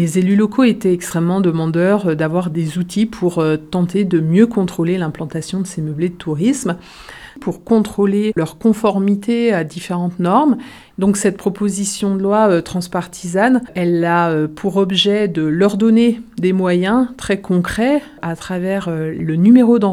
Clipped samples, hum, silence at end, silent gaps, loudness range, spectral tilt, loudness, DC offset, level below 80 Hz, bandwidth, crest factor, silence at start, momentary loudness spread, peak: under 0.1%; none; 0 s; none; 3 LU; -6 dB/octave; -16 LUFS; under 0.1%; -48 dBFS; 14 kHz; 16 dB; 0 s; 9 LU; 0 dBFS